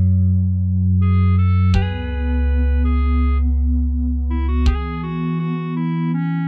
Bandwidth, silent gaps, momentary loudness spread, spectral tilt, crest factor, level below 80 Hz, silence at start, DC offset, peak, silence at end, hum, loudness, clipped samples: 4.9 kHz; none; 7 LU; -9 dB/octave; 12 dB; -20 dBFS; 0 s; under 0.1%; -4 dBFS; 0 s; none; -19 LUFS; under 0.1%